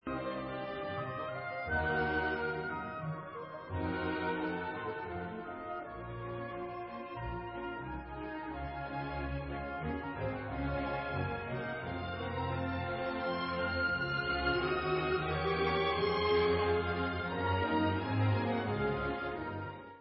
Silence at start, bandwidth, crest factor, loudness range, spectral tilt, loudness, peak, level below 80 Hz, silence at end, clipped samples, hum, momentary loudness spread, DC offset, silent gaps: 0.05 s; 5.6 kHz; 18 dB; 9 LU; -4.5 dB/octave; -36 LUFS; -18 dBFS; -50 dBFS; 0 s; under 0.1%; none; 10 LU; under 0.1%; none